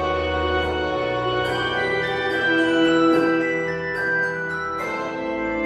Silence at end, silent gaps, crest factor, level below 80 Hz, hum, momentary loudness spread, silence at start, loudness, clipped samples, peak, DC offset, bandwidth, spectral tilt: 0 s; none; 14 dB; -42 dBFS; none; 8 LU; 0 s; -21 LUFS; under 0.1%; -8 dBFS; under 0.1%; 11.5 kHz; -5.5 dB/octave